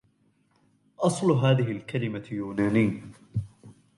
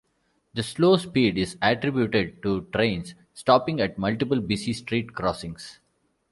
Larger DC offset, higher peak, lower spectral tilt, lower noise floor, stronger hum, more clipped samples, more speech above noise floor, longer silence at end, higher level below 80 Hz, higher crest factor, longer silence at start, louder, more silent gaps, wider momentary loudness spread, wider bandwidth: neither; second, -8 dBFS vs -4 dBFS; about the same, -7 dB/octave vs -6 dB/octave; about the same, -67 dBFS vs -70 dBFS; neither; neither; second, 41 dB vs 46 dB; second, 0.25 s vs 0.6 s; second, -58 dBFS vs -52 dBFS; about the same, 18 dB vs 22 dB; first, 1 s vs 0.55 s; second, -27 LUFS vs -24 LUFS; neither; about the same, 12 LU vs 14 LU; about the same, 11.5 kHz vs 11.5 kHz